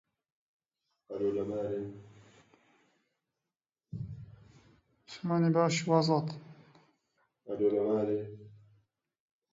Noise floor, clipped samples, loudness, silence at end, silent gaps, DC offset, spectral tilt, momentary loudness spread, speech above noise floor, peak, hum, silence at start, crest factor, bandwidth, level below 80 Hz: under -90 dBFS; under 0.1%; -31 LUFS; 1 s; none; under 0.1%; -6.5 dB/octave; 21 LU; over 60 dB; -12 dBFS; none; 1.1 s; 22 dB; 7.8 kHz; -68 dBFS